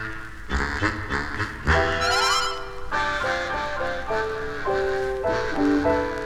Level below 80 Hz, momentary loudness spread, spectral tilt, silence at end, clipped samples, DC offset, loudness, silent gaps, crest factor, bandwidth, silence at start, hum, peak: -36 dBFS; 8 LU; -4 dB/octave; 0 s; under 0.1%; under 0.1%; -24 LUFS; none; 20 dB; 16 kHz; 0 s; none; -6 dBFS